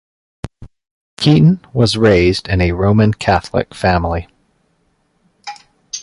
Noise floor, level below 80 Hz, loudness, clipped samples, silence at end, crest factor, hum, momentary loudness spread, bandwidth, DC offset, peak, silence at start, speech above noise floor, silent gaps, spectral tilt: -61 dBFS; -32 dBFS; -14 LUFS; under 0.1%; 0 s; 14 dB; none; 21 LU; 11.5 kHz; under 0.1%; 0 dBFS; 0.45 s; 48 dB; 0.91-1.17 s; -6.5 dB/octave